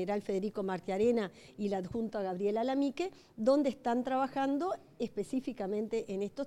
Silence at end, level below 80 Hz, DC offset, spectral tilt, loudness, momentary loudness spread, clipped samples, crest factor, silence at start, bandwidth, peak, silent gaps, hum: 0 s; -66 dBFS; under 0.1%; -6.5 dB/octave; -34 LUFS; 8 LU; under 0.1%; 16 dB; 0 s; 13 kHz; -18 dBFS; none; none